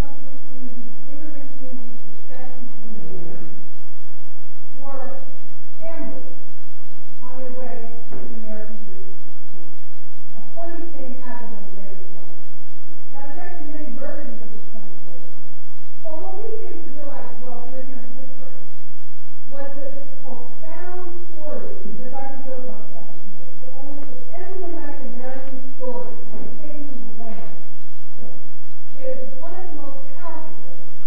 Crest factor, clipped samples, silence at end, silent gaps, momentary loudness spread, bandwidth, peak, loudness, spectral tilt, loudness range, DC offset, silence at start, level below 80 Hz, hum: 20 dB; under 0.1%; 0 s; none; 17 LU; 5.2 kHz; -4 dBFS; -38 LUFS; -9.5 dB/octave; 5 LU; 50%; 0 s; -62 dBFS; none